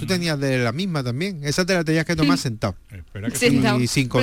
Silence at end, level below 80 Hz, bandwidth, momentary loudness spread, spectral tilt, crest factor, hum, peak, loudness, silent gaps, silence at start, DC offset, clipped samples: 0 s; -44 dBFS; 16.5 kHz; 9 LU; -5 dB/octave; 14 dB; none; -6 dBFS; -21 LUFS; none; 0 s; under 0.1%; under 0.1%